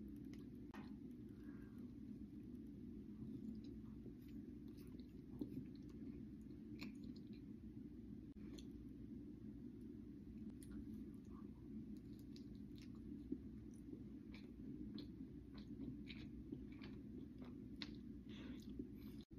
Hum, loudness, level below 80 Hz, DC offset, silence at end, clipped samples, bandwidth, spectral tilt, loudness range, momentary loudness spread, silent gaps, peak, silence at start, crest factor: none; -56 LUFS; -66 dBFS; under 0.1%; 0 s; under 0.1%; 14 kHz; -7 dB/octave; 1 LU; 4 LU; 19.25-19.30 s; -30 dBFS; 0 s; 26 dB